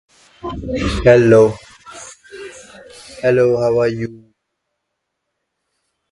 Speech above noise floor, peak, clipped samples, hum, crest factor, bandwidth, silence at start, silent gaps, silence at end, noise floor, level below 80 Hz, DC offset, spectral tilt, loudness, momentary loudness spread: 62 dB; 0 dBFS; under 0.1%; none; 18 dB; 11.5 kHz; 0.45 s; none; 1.95 s; -75 dBFS; -36 dBFS; under 0.1%; -6.5 dB/octave; -14 LUFS; 24 LU